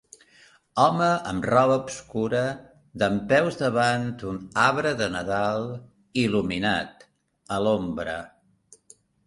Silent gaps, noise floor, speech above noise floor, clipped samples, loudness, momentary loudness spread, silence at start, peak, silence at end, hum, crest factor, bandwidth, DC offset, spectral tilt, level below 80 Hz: none; -57 dBFS; 33 dB; under 0.1%; -24 LUFS; 12 LU; 0.75 s; -6 dBFS; 1 s; none; 20 dB; 11.5 kHz; under 0.1%; -5.5 dB/octave; -54 dBFS